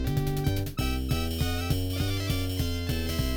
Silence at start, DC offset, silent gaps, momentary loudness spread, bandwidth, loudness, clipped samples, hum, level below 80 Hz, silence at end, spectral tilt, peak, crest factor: 0 s; under 0.1%; none; 2 LU; over 20 kHz; -29 LUFS; under 0.1%; none; -34 dBFS; 0 s; -5.5 dB/octave; -14 dBFS; 14 dB